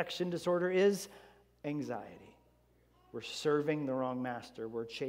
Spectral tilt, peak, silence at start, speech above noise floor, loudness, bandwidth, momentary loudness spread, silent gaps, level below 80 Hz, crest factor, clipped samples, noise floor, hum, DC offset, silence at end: -5.5 dB/octave; -18 dBFS; 0 s; 34 dB; -35 LUFS; 16 kHz; 15 LU; none; -74 dBFS; 18 dB; under 0.1%; -69 dBFS; none; under 0.1%; 0 s